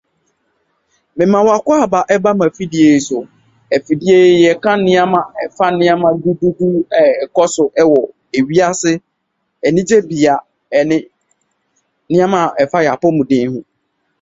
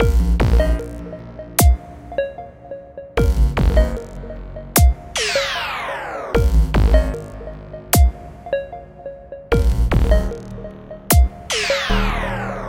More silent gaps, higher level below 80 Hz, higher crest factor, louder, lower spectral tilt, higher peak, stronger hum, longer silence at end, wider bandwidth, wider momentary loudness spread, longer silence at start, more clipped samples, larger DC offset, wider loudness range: neither; second, -54 dBFS vs -20 dBFS; about the same, 14 dB vs 18 dB; first, -13 LUFS vs -19 LUFS; about the same, -5.5 dB/octave vs -5 dB/octave; about the same, 0 dBFS vs 0 dBFS; neither; first, 0.6 s vs 0 s; second, 8 kHz vs 17 kHz; second, 8 LU vs 18 LU; first, 1.15 s vs 0 s; neither; neither; about the same, 4 LU vs 2 LU